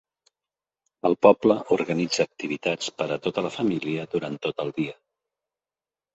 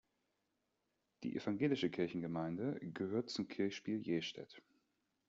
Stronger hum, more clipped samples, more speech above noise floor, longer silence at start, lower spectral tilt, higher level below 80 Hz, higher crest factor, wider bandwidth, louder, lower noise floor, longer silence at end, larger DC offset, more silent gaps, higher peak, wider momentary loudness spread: neither; neither; first, over 66 dB vs 45 dB; second, 1.05 s vs 1.2 s; about the same, -5 dB/octave vs -5.5 dB/octave; first, -66 dBFS vs -80 dBFS; first, 24 dB vs 18 dB; about the same, 8.2 kHz vs 7.6 kHz; first, -25 LUFS vs -41 LUFS; first, under -90 dBFS vs -85 dBFS; first, 1.2 s vs 0.7 s; neither; neither; first, -2 dBFS vs -24 dBFS; about the same, 11 LU vs 9 LU